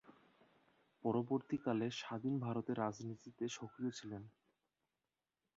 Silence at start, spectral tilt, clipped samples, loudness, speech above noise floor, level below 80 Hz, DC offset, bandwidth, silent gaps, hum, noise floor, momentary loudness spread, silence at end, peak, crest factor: 0.05 s; -6 dB/octave; under 0.1%; -42 LUFS; over 49 dB; -80 dBFS; under 0.1%; 7.6 kHz; none; none; under -90 dBFS; 11 LU; 1.3 s; -24 dBFS; 20 dB